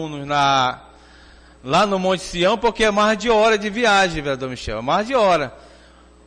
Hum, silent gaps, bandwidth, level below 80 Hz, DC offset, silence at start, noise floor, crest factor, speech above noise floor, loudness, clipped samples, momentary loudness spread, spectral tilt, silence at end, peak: none; none; 10 kHz; -42 dBFS; under 0.1%; 0 s; -48 dBFS; 12 dB; 29 dB; -18 LUFS; under 0.1%; 10 LU; -4 dB/octave; 0.65 s; -8 dBFS